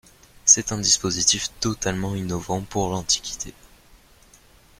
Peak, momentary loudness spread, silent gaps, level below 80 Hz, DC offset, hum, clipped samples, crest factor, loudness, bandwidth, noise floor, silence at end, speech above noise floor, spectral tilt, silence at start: -2 dBFS; 12 LU; none; -48 dBFS; under 0.1%; none; under 0.1%; 22 dB; -21 LUFS; 16.5 kHz; -53 dBFS; 1.15 s; 28 dB; -2 dB/octave; 0.45 s